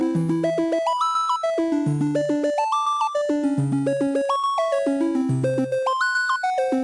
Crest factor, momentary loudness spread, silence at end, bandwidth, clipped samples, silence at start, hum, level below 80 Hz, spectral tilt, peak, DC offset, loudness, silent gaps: 10 dB; 1 LU; 0 s; 11.5 kHz; under 0.1%; 0 s; none; -64 dBFS; -6 dB/octave; -10 dBFS; under 0.1%; -22 LUFS; none